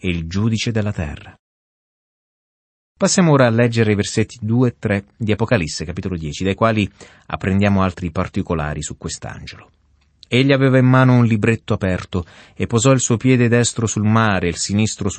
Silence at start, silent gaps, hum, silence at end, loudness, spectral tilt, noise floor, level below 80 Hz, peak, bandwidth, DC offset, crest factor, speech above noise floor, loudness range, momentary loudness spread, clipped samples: 0.05 s; 1.39-2.95 s; none; 0 s; -17 LUFS; -5.5 dB/octave; -51 dBFS; -42 dBFS; -2 dBFS; 8.8 kHz; under 0.1%; 16 dB; 34 dB; 5 LU; 13 LU; under 0.1%